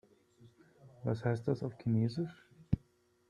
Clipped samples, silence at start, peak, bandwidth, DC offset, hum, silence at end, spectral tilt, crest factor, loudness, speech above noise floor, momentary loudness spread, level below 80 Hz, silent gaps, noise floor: under 0.1%; 0.4 s; -14 dBFS; 9.6 kHz; under 0.1%; none; 0.5 s; -9 dB/octave; 22 dB; -37 LUFS; 36 dB; 8 LU; -58 dBFS; none; -71 dBFS